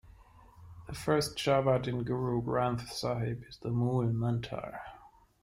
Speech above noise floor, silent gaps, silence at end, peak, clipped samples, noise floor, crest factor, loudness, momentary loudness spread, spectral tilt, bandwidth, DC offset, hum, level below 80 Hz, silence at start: 26 dB; none; 0.35 s; -14 dBFS; under 0.1%; -57 dBFS; 18 dB; -32 LUFS; 14 LU; -6.5 dB/octave; 16 kHz; under 0.1%; none; -56 dBFS; 0.05 s